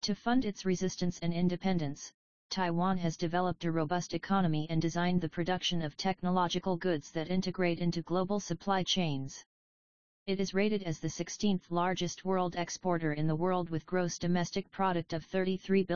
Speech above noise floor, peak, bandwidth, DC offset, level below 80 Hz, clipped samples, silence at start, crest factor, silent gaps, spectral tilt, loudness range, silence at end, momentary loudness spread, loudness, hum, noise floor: over 58 dB; -16 dBFS; 7.2 kHz; 0.5%; -58 dBFS; under 0.1%; 0 s; 16 dB; 2.14-2.50 s, 9.46-10.26 s; -5.5 dB/octave; 2 LU; 0 s; 5 LU; -33 LUFS; none; under -90 dBFS